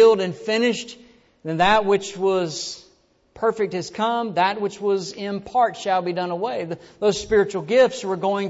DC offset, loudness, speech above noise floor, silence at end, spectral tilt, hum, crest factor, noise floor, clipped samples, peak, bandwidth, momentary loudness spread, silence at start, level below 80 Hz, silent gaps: under 0.1%; -22 LUFS; 37 dB; 0 s; -4.5 dB/octave; none; 16 dB; -59 dBFS; under 0.1%; -6 dBFS; 8 kHz; 12 LU; 0 s; -52 dBFS; none